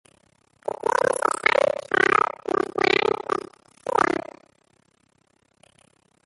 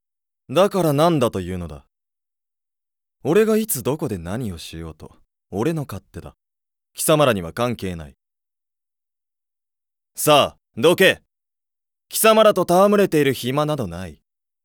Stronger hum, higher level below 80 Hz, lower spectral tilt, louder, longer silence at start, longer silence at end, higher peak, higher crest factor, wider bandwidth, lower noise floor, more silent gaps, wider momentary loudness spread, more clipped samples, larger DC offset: neither; second, -62 dBFS vs -54 dBFS; second, -3 dB/octave vs -4.5 dB/octave; second, -22 LUFS vs -19 LUFS; first, 0.65 s vs 0.5 s; first, 2.05 s vs 0.5 s; second, -4 dBFS vs 0 dBFS; about the same, 22 dB vs 20 dB; second, 12 kHz vs over 20 kHz; second, -65 dBFS vs -89 dBFS; neither; second, 15 LU vs 20 LU; neither; neither